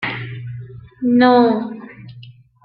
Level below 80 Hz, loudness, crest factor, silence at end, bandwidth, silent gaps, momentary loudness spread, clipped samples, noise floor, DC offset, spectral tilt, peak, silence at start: -56 dBFS; -15 LUFS; 16 dB; 0.35 s; 5 kHz; none; 25 LU; under 0.1%; -42 dBFS; under 0.1%; -10 dB/octave; -2 dBFS; 0 s